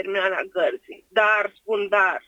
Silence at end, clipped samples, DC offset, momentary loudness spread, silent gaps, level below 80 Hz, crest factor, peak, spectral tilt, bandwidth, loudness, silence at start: 0.1 s; under 0.1%; under 0.1%; 7 LU; none; -72 dBFS; 18 dB; -4 dBFS; -3.5 dB/octave; 10 kHz; -22 LUFS; 0 s